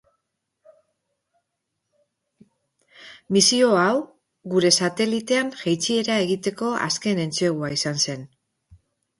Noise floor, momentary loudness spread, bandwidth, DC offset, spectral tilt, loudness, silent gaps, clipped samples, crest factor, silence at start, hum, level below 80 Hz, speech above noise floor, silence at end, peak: -79 dBFS; 8 LU; 11.5 kHz; under 0.1%; -3.5 dB/octave; -21 LUFS; none; under 0.1%; 22 dB; 3 s; none; -66 dBFS; 58 dB; 0.45 s; -4 dBFS